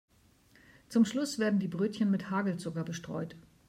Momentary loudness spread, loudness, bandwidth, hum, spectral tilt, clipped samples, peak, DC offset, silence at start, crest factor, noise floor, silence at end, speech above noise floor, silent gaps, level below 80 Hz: 10 LU; -32 LUFS; 14.5 kHz; none; -6 dB/octave; under 0.1%; -16 dBFS; under 0.1%; 0.9 s; 16 dB; -64 dBFS; 0.3 s; 33 dB; none; -70 dBFS